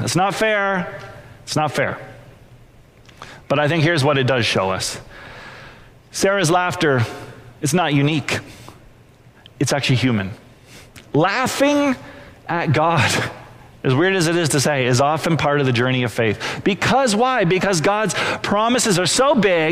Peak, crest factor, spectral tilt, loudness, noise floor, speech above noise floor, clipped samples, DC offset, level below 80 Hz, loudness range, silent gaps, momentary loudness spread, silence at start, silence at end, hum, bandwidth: -6 dBFS; 14 dB; -4.5 dB/octave; -18 LUFS; -48 dBFS; 30 dB; under 0.1%; under 0.1%; -50 dBFS; 5 LU; none; 17 LU; 0 s; 0 s; none; 16 kHz